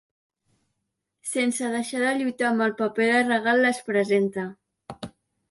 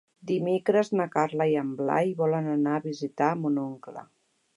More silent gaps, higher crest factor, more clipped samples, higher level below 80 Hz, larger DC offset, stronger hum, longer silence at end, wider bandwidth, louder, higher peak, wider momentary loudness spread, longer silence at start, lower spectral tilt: neither; about the same, 16 dB vs 18 dB; neither; first, -68 dBFS vs -78 dBFS; neither; neither; second, 0.4 s vs 0.55 s; about the same, 12 kHz vs 11 kHz; first, -23 LUFS vs -27 LUFS; about the same, -10 dBFS vs -8 dBFS; first, 16 LU vs 10 LU; first, 1.25 s vs 0.25 s; second, -4 dB/octave vs -7.5 dB/octave